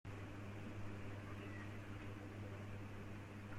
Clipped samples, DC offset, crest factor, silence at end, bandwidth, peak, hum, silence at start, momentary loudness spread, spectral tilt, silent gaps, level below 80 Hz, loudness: under 0.1%; under 0.1%; 12 dB; 0 s; 14.5 kHz; -38 dBFS; none; 0.05 s; 1 LU; -7 dB/octave; none; -64 dBFS; -52 LUFS